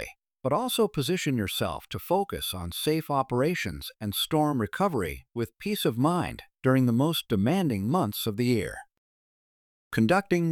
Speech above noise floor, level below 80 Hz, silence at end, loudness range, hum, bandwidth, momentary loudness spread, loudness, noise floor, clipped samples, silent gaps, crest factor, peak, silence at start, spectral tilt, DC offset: over 63 dB; -54 dBFS; 0 s; 2 LU; none; 19.5 kHz; 10 LU; -27 LUFS; under -90 dBFS; under 0.1%; 8.98-9.91 s; 18 dB; -10 dBFS; 0 s; -5.5 dB/octave; under 0.1%